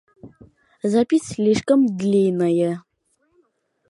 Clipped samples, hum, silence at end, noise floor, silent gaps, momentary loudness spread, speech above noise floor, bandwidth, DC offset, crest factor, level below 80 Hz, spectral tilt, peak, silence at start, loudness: under 0.1%; none; 1.1 s; -68 dBFS; none; 7 LU; 49 dB; 11.5 kHz; under 0.1%; 16 dB; -60 dBFS; -6.5 dB/octave; -6 dBFS; 0.25 s; -19 LUFS